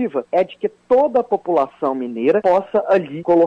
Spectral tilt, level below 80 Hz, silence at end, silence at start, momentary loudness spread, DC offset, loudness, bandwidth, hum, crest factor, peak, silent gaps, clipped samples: -8 dB/octave; -60 dBFS; 0 s; 0 s; 7 LU; under 0.1%; -18 LUFS; 7 kHz; none; 12 dB; -6 dBFS; none; under 0.1%